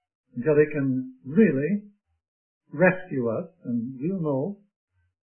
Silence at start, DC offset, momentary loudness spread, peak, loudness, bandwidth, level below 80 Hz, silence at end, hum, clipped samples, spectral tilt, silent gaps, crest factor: 0.35 s; under 0.1%; 11 LU; -6 dBFS; -25 LUFS; 3.3 kHz; -64 dBFS; 0.8 s; none; under 0.1%; -13 dB/octave; 2.28-2.61 s; 20 dB